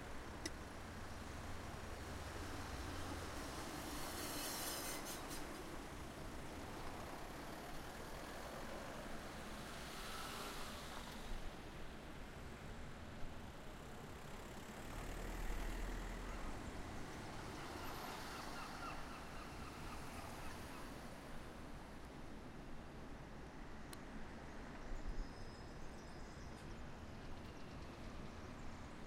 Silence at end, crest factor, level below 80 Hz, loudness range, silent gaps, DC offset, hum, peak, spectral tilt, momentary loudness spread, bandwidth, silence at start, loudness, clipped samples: 0 s; 20 dB; -54 dBFS; 7 LU; none; under 0.1%; none; -30 dBFS; -4 dB/octave; 7 LU; 16 kHz; 0 s; -51 LUFS; under 0.1%